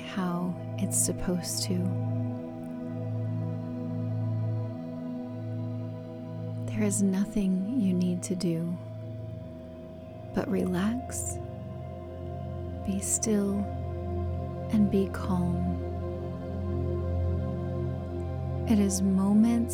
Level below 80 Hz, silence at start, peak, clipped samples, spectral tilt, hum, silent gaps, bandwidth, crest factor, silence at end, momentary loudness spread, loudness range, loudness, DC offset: -48 dBFS; 0 s; -12 dBFS; under 0.1%; -6 dB/octave; none; none; 17.5 kHz; 18 dB; 0 s; 13 LU; 5 LU; -30 LUFS; under 0.1%